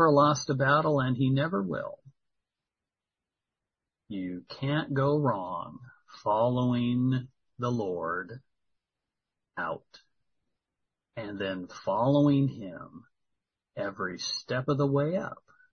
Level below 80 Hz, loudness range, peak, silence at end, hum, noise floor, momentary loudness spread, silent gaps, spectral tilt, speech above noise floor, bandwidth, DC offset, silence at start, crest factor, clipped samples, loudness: -66 dBFS; 10 LU; -10 dBFS; 0.4 s; none; under -90 dBFS; 18 LU; none; -6.5 dB/octave; over 62 dB; 6.6 kHz; under 0.1%; 0 s; 20 dB; under 0.1%; -29 LUFS